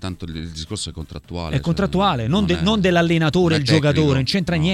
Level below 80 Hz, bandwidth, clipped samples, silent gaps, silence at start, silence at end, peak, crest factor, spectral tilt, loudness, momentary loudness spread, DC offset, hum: -38 dBFS; 12.5 kHz; under 0.1%; none; 0 s; 0 s; 0 dBFS; 18 dB; -6 dB/octave; -18 LUFS; 14 LU; under 0.1%; none